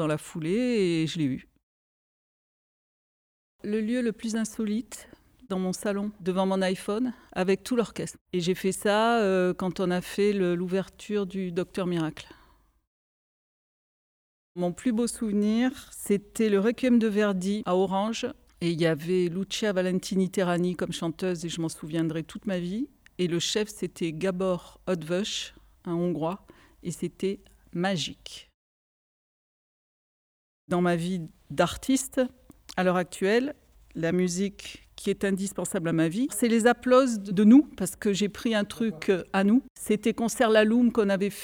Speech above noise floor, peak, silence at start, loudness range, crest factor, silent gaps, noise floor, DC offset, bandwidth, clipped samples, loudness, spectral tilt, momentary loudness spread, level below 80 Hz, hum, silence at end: 35 dB; -8 dBFS; 0 s; 11 LU; 20 dB; 1.63-3.59 s, 8.21-8.26 s, 12.87-14.55 s, 28.54-30.68 s, 39.70-39.75 s; -61 dBFS; under 0.1%; 19 kHz; under 0.1%; -27 LUFS; -5.5 dB/octave; 11 LU; -60 dBFS; none; 0 s